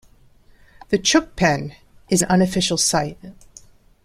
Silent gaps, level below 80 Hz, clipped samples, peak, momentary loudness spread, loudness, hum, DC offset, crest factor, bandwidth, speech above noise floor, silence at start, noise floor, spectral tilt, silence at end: none; -46 dBFS; under 0.1%; -2 dBFS; 9 LU; -19 LUFS; none; under 0.1%; 20 dB; 16 kHz; 32 dB; 0.9 s; -51 dBFS; -3.5 dB/octave; 0.7 s